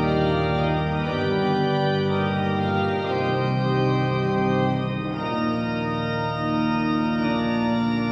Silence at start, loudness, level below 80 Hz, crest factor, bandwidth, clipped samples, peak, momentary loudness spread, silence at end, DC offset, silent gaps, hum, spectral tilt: 0 s; -23 LUFS; -44 dBFS; 14 dB; 7.8 kHz; under 0.1%; -8 dBFS; 4 LU; 0 s; under 0.1%; none; none; -8 dB/octave